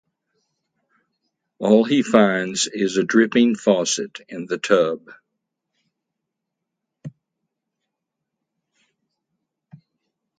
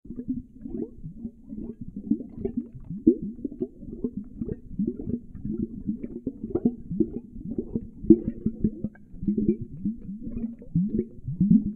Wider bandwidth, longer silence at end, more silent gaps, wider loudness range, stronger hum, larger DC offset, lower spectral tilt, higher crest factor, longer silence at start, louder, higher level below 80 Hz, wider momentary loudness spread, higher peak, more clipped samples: first, 9.6 kHz vs 2.4 kHz; first, 3.3 s vs 0 s; neither; first, 8 LU vs 5 LU; neither; neither; second, -4 dB/octave vs -14 dB/octave; about the same, 22 dB vs 26 dB; first, 1.6 s vs 0.05 s; first, -19 LUFS vs -30 LUFS; second, -70 dBFS vs -44 dBFS; first, 18 LU vs 15 LU; about the same, 0 dBFS vs -2 dBFS; neither